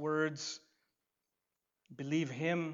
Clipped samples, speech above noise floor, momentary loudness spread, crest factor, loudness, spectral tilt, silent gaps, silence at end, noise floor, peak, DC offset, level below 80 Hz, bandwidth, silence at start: under 0.1%; 52 dB; 11 LU; 18 dB; -37 LUFS; -5 dB/octave; none; 0 s; -88 dBFS; -22 dBFS; under 0.1%; -86 dBFS; 7.8 kHz; 0 s